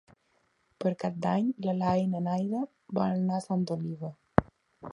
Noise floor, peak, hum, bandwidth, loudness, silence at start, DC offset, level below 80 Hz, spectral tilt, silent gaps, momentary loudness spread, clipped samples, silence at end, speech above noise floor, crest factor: -72 dBFS; -2 dBFS; none; 10.5 kHz; -30 LUFS; 0.8 s; under 0.1%; -54 dBFS; -8 dB/octave; none; 7 LU; under 0.1%; 0 s; 42 dB; 30 dB